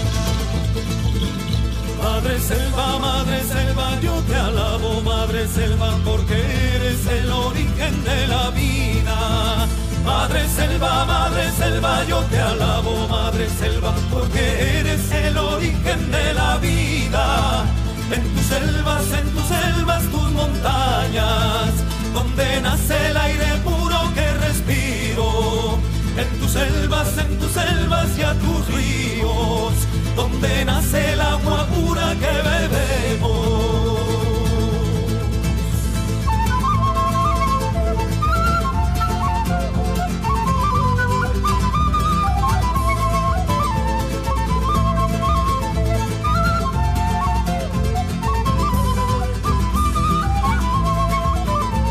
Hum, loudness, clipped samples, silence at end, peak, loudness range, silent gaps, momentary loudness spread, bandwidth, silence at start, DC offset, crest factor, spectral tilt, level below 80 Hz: none; -19 LUFS; under 0.1%; 0 s; -6 dBFS; 1 LU; none; 3 LU; 15.5 kHz; 0 s; under 0.1%; 12 dB; -5 dB/octave; -22 dBFS